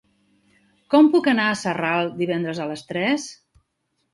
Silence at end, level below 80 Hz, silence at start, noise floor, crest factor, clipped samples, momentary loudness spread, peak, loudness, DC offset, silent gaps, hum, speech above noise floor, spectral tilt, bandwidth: 0.8 s; -66 dBFS; 0.9 s; -73 dBFS; 18 dB; under 0.1%; 12 LU; -4 dBFS; -21 LUFS; under 0.1%; none; none; 53 dB; -5 dB/octave; 11.5 kHz